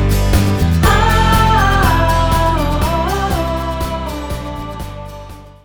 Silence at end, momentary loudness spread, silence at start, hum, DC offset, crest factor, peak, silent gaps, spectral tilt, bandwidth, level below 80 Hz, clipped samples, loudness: 0.15 s; 15 LU; 0 s; none; under 0.1%; 14 dB; 0 dBFS; none; -5.5 dB/octave; over 20 kHz; -20 dBFS; under 0.1%; -14 LUFS